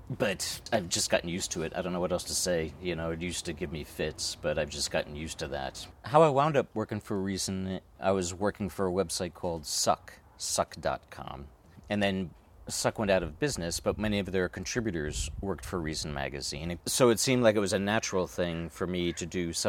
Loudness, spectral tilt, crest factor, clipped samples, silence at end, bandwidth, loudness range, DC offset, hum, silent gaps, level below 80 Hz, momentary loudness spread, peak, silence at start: -31 LUFS; -4 dB/octave; 22 dB; under 0.1%; 0 s; 17.5 kHz; 4 LU; under 0.1%; none; none; -50 dBFS; 11 LU; -8 dBFS; 0 s